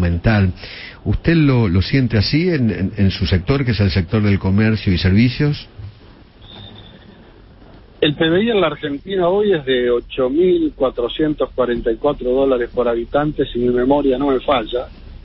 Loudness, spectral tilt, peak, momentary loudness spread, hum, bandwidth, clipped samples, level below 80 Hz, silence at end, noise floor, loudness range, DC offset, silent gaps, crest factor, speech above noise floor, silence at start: -17 LUFS; -11 dB/octave; -2 dBFS; 10 LU; none; 5.8 kHz; under 0.1%; -34 dBFS; 0.05 s; -43 dBFS; 5 LU; under 0.1%; none; 16 dB; 27 dB; 0 s